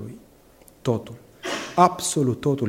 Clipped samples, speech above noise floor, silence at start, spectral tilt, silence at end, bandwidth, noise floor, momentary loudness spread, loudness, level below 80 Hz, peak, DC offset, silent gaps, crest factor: under 0.1%; 31 dB; 0 s; -5 dB/octave; 0 s; 16.5 kHz; -52 dBFS; 17 LU; -23 LUFS; -58 dBFS; -2 dBFS; under 0.1%; none; 22 dB